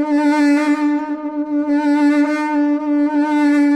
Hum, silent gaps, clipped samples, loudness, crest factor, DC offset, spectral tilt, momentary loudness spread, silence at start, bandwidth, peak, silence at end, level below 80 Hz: none; none; under 0.1%; -16 LUFS; 10 dB; under 0.1%; -4 dB/octave; 7 LU; 0 s; 9 kHz; -6 dBFS; 0 s; -64 dBFS